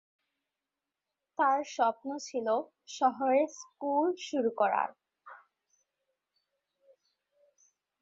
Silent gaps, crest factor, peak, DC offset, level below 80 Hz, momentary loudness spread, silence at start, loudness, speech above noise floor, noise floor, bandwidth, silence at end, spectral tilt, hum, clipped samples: none; 18 dB; -14 dBFS; under 0.1%; -84 dBFS; 10 LU; 1.4 s; -31 LUFS; 59 dB; -90 dBFS; 7.8 kHz; 2.65 s; -3.5 dB/octave; none; under 0.1%